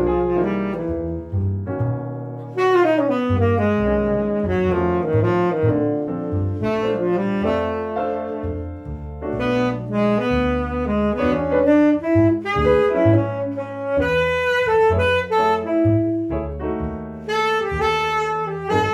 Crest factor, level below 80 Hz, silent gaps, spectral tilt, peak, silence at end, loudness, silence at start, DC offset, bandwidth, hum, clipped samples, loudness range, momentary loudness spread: 16 dB; -38 dBFS; none; -7.5 dB/octave; -4 dBFS; 0 s; -20 LUFS; 0 s; under 0.1%; 12.5 kHz; none; under 0.1%; 5 LU; 9 LU